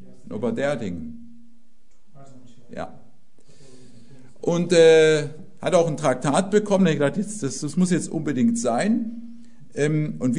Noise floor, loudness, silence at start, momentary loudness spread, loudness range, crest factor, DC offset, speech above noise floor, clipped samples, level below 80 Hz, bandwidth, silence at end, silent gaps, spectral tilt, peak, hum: -62 dBFS; -21 LUFS; 0.3 s; 20 LU; 14 LU; 18 dB; 1%; 41 dB; under 0.1%; -60 dBFS; 11 kHz; 0 s; none; -5.5 dB/octave; -4 dBFS; none